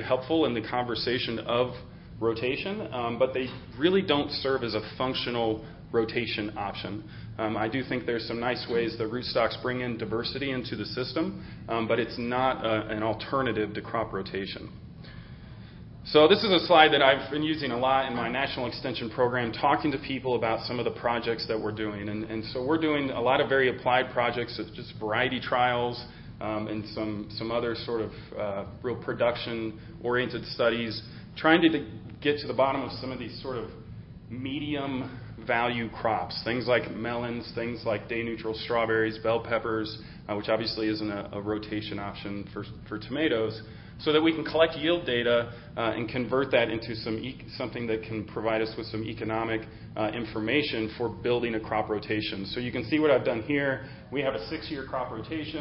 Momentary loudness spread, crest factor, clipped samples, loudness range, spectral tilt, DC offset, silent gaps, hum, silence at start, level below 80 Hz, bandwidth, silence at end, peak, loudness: 12 LU; 26 dB; under 0.1%; 7 LU; -9.5 dB/octave; under 0.1%; none; none; 0 s; -54 dBFS; 5.8 kHz; 0 s; -4 dBFS; -28 LUFS